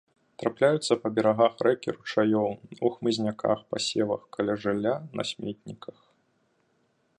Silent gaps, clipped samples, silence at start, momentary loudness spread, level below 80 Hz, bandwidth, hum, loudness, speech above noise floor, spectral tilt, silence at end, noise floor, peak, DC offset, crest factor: none; under 0.1%; 0.4 s; 11 LU; -68 dBFS; 11 kHz; none; -27 LUFS; 43 dB; -5 dB/octave; 1.45 s; -70 dBFS; -8 dBFS; under 0.1%; 20 dB